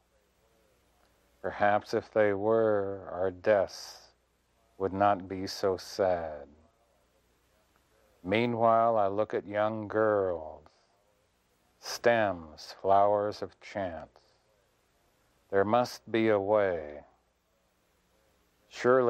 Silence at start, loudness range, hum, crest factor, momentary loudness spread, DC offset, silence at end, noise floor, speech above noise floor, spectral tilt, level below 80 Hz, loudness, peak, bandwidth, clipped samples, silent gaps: 1.45 s; 4 LU; none; 20 dB; 16 LU; under 0.1%; 0 s; -72 dBFS; 44 dB; -5.5 dB/octave; -66 dBFS; -29 LUFS; -12 dBFS; 14.5 kHz; under 0.1%; none